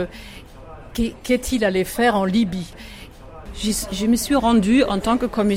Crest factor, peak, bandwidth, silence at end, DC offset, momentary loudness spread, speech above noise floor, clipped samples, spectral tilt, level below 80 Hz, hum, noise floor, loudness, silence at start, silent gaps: 14 dB; -6 dBFS; 16.5 kHz; 0 s; under 0.1%; 23 LU; 19 dB; under 0.1%; -4.5 dB/octave; -38 dBFS; none; -39 dBFS; -20 LUFS; 0 s; none